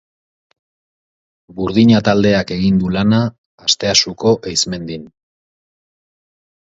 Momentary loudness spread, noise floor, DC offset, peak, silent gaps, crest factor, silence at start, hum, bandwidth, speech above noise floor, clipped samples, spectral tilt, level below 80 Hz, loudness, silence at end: 13 LU; under -90 dBFS; under 0.1%; 0 dBFS; 3.38-3.58 s; 18 dB; 1.55 s; none; 8 kHz; over 76 dB; under 0.1%; -4.5 dB/octave; -44 dBFS; -15 LUFS; 1.6 s